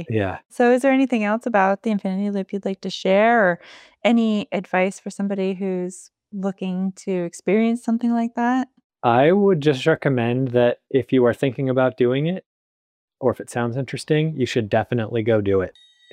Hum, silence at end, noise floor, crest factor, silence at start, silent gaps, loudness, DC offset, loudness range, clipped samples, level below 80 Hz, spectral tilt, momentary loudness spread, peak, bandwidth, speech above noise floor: none; 0.4 s; under -90 dBFS; 18 dB; 0 s; 8.84-8.90 s, 12.46-13.08 s; -21 LUFS; under 0.1%; 5 LU; under 0.1%; -66 dBFS; -6.5 dB/octave; 10 LU; -4 dBFS; 12 kHz; over 70 dB